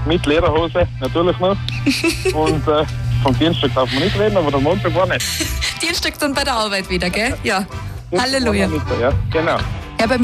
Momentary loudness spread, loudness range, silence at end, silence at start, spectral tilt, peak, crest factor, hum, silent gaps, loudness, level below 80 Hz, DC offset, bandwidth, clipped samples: 4 LU; 2 LU; 0 s; 0 s; -5 dB/octave; -4 dBFS; 14 dB; none; none; -17 LUFS; -30 dBFS; under 0.1%; 15.5 kHz; under 0.1%